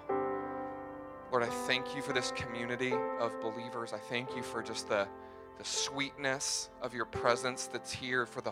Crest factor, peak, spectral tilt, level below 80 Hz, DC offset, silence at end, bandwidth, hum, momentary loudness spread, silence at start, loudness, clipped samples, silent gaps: 24 dB; -12 dBFS; -2.5 dB/octave; -66 dBFS; under 0.1%; 0 s; 16.5 kHz; none; 8 LU; 0 s; -36 LUFS; under 0.1%; none